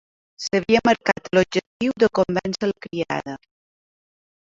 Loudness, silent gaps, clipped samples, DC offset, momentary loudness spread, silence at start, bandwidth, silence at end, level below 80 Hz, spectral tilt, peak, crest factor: -21 LUFS; 1.67-1.80 s; under 0.1%; under 0.1%; 11 LU; 0.4 s; 7.8 kHz; 1.15 s; -56 dBFS; -5 dB/octave; -2 dBFS; 20 dB